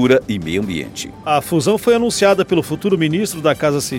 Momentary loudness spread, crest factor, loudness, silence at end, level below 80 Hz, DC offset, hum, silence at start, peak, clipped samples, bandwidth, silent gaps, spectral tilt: 8 LU; 14 dB; -17 LUFS; 0 s; -46 dBFS; under 0.1%; none; 0 s; -2 dBFS; under 0.1%; 17 kHz; none; -5 dB/octave